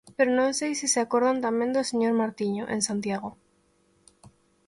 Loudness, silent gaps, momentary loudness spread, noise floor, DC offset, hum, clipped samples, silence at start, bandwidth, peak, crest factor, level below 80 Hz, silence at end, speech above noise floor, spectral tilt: -26 LUFS; none; 7 LU; -66 dBFS; under 0.1%; none; under 0.1%; 0.05 s; 11.5 kHz; -8 dBFS; 18 dB; -68 dBFS; 1.35 s; 41 dB; -3.5 dB/octave